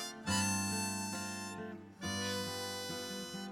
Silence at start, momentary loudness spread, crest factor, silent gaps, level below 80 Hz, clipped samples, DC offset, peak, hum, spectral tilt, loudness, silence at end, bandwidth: 0 s; 10 LU; 18 dB; none; -70 dBFS; under 0.1%; under 0.1%; -22 dBFS; none; -3 dB/octave; -38 LUFS; 0 s; 18.5 kHz